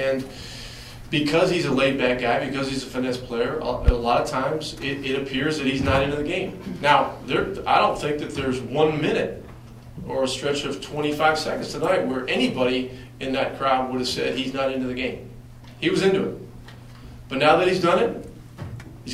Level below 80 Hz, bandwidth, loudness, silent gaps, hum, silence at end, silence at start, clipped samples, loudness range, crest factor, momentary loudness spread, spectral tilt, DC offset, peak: -38 dBFS; 16 kHz; -23 LUFS; none; none; 0 s; 0 s; under 0.1%; 3 LU; 20 dB; 18 LU; -5 dB/octave; under 0.1%; -4 dBFS